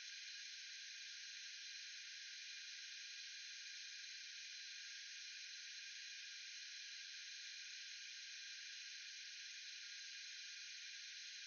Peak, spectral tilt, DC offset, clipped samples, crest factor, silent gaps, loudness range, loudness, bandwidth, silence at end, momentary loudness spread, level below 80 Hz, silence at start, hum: -40 dBFS; 11 dB/octave; under 0.1%; under 0.1%; 14 dB; none; 0 LU; -51 LUFS; 7.6 kHz; 0 s; 0 LU; under -90 dBFS; 0 s; none